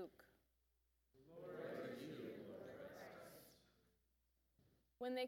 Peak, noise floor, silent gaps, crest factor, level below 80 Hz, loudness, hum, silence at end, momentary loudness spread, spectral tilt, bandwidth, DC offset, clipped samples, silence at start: -34 dBFS; -84 dBFS; none; 20 dB; -84 dBFS; -54 LUFS; none; 0 s; 12 LU; -5.5 dB/octave; 19 kHz; under 0.1%; under 0.1%; 0 s